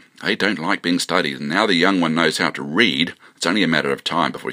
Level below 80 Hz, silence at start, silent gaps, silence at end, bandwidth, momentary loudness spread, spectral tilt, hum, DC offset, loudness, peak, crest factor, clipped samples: -62 dBFS; 0.2 s; none; 0 s; 15.5 kHz; 5 LU; -4 dB/octave; none; under 0.1%; -19 LUFS; 0 dBFS; 20 dB; under 0.1%